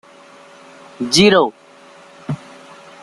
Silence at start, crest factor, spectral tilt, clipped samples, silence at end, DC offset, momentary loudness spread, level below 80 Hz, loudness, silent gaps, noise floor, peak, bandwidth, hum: 1 s; 18 dB; -4 dB/octave; under 0.1%; 0.65 s; under 0.1%; 18 LU; -54 dBFS; -15 LUFS; none; -44 dBFS; 0 dBFS; 12.5 kHz; none